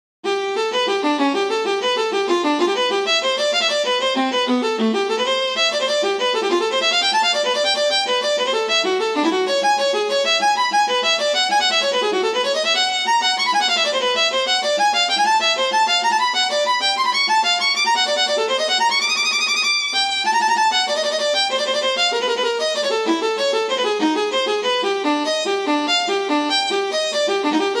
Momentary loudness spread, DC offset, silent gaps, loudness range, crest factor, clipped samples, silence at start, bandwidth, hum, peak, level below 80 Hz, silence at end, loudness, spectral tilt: 4 LU; under 0.1%; none; 2 LU; 12 dB; under 0.1%; 0.25 s; 15 kHz; none; -6 dBFS; -64 dBFS; 0 s; -17 LUFS; -0.5 dB/octave